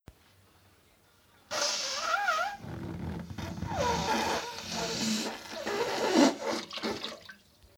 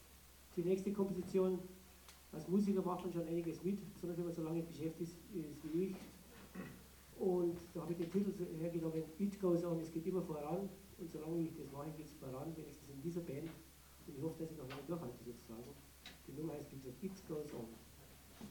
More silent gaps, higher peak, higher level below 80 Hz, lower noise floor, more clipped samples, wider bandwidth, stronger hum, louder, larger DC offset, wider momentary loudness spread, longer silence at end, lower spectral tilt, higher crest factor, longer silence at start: neither; first, -10 dBFS vs -26 dBFS; first, -56 dBFS vs -68 dBFS; about the same, -64 dBFS vs -62 dBFS; neither; about the same, over 20 kHz vs 19 kHz; neither; first, -31 LUFS vs -43 LUFS; neither; second, 13 LU vs 18 LU; first, 0.45 s vs 0 s; second, -3.5 dB/octave vs -7.5 dB/octave; first, 24 dB vs 18 dB; first, 1.5 s vs 0 s